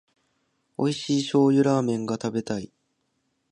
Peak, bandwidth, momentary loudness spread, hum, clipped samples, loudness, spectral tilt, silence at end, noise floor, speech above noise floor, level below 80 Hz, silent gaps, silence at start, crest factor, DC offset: -8 dBFS; 10.5 kHz; 13 LU; none; under 0.1%; -24 LUFS; -6 dB/octave; 0.85 s; -74 dBFS; 51 dB; -66 dBFS; none; 0.8 s; 18 dB; under 0.1%